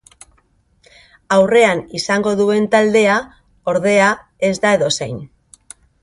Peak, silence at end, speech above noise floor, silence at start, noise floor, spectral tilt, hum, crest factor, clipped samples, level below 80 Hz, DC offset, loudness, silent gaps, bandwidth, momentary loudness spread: 0 dBFS; 0.75 s; 43 dB; 1.3 s; -58 dBFS; -4.5 dB/octave; none; 16 dB; under 0.1%; -54 dBFS; under 0.1%; -15 LUFS; none; 11.5 kHz; 9 LU